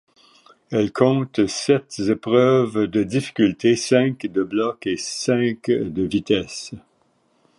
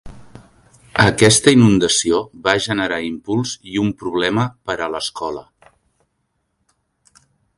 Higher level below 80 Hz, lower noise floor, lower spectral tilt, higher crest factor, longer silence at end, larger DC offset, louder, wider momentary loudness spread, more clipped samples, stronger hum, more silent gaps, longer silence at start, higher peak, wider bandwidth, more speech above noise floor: second, -54 dBFS vs -46 dBFS; second, -63 dBFS vs -70 dBFS; first, -5.5 dB/octave vs -4 dB/octave; about the same, 18 dB vs 18 dB; second, 0.8 s vs 2.15 s; neither; second, -20 LUFS vs -17 LUFS; second, 7 LU vs 13 LU; neither; neither; neither; first, 0.7 s vs 0.05 s; about the same, -2 dBFS vs 0 dBFS; about the same, 11.5 kHz vs 11.5 kHz; second, 43 dB vs 53 dB